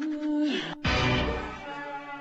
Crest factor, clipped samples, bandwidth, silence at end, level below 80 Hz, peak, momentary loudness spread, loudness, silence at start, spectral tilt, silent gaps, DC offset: 16 dB; under 0.1%; 8.2 kHz; 0 s; -40 dBFS; -12 dBFS; 12 LU; -29 LUFS; 0 s; -5.5 dB/octave; none; under 0.1%